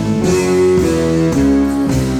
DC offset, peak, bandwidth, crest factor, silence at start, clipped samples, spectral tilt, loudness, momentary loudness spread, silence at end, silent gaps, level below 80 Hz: under 0.1%; -2 dBFS; over 20 kHz; 10 dB; 0 s; under 0.1%; -6.5 dB/octave; -13 LUFS; 2 LU; 0 s; none; -28 dBFS